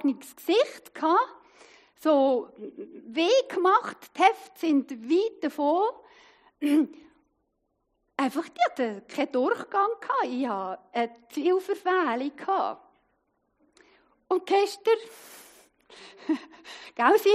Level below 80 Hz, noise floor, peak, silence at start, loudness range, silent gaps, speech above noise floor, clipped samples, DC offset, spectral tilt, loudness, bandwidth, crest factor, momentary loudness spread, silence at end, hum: -80 dBFS; -76 dBFS; -6 dBFS; 0 s; 5 LU; none; 50 dB; under 0.1%; under 0.1%; -3.5 dB/octave; -26 LUFS; 15.5 kHz; 22 dB; 14 LU; 0 s; none